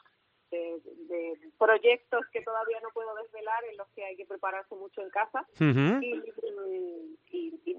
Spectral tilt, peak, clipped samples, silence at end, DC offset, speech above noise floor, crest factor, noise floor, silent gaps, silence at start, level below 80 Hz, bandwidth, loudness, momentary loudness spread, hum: -5 dB/octave; -10 dBFS; under 0.1%; 0 s; under 0.1%; 38 dB; 20 dB; -69 dBFS; none; 0.5 s; -78 dBFS; 7.2 kHz; -31 LUFS; 17 LU; none